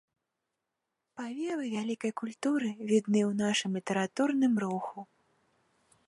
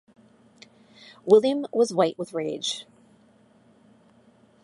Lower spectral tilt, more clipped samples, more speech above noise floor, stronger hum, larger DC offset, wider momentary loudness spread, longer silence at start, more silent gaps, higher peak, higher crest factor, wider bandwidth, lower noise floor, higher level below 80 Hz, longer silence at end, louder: about the same, -5 dB/octave vs -4.5 dB/octave; neither; first, 55 dB vs 36 dB; neither; neither; about the same, 13 LU vs 13 LU; about the same, 1.15 s vs 1.25 s; neither; second, -14 dBFS vs -6 dBFS; about the same, 18 dB vs 22 dB; about the same, 11.5 kHz vs 11.5 kHz; first, -86 dBFS vs -58 dBFS; about the same, -80 dBFS vs -78 dBFS; second, 1.05 s vs 1.8 s; second, -31 LUFS vs -24 LUFS